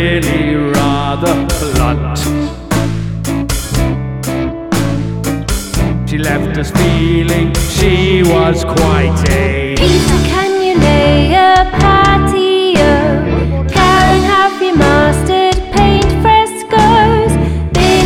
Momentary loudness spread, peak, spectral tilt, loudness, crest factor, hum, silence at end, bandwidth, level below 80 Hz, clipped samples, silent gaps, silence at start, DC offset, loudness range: 8 LU; 0 dBFS; -5.5 dB/octave; -11 LUFS; 10 dB; none; 0 s; 18 kHz; -20 dBFS; under 0.1%; none; 0 s; 0.9%; 6 LU